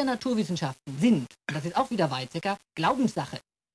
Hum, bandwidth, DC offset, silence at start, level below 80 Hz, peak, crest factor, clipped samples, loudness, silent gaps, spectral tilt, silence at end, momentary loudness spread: none; 11 kHz; under 0.1%; 0 s; -64 dBFS; -12 dBFS; 16 dB; under 0.1%; -28 LUFS; none; -6 dB/octave; 0.35 s; 10 LU